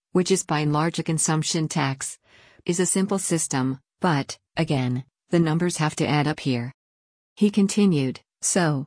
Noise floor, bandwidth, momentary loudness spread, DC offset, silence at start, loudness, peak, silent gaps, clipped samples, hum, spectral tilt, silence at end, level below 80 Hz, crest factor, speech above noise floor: under -90 dBFS; 10.5 kHz; 8 LU; under 0.1%; 0.15 s; -23 LUFS; -8 dBFS; 6.74-7.36 s; under 0.1%; none; -5 dB/octave; 0 s; -60 dBFS; 16 dB; over 67 dB